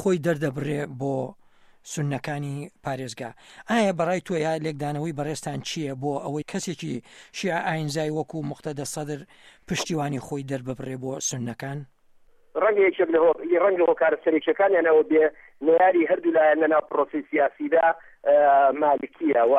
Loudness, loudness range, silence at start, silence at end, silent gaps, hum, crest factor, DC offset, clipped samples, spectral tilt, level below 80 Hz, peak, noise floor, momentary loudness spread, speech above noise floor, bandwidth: -24 LUFS; 10 LU; 0 s; 0 s; none; none; 14 dB; under 0.1%; under 0.1%; -5.5 dB/octave; -62 dBFS; -10 dBFS; -56 dBFS; 14 LU; 32 dB; 14 kHz